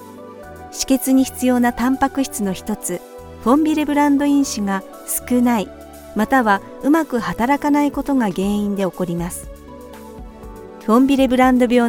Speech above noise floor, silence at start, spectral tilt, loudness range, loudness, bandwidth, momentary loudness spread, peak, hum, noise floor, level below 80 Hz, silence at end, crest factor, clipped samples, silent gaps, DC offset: 20 dB; 0 s; -5 dB/octave; 3 LU; -18 LUFS; 18 kHz; 22 LU; -2 dBFS; none; -37 dBFS; -42 dBFS; 0 s; 16 dB; under 0.1%; none; under 0.1%